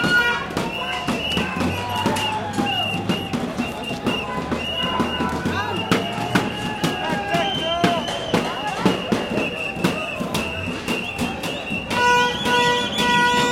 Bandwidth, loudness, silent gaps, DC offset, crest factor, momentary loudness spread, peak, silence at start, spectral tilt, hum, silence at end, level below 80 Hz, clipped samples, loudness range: 17 kHz; -21 LUFS; none; under 0.1%; 20 dB; 8 LU; -2 dBFS; 0 s; -4 dB/octave; none; 0 s; -46 dBFS; under 0.1%; 2 LU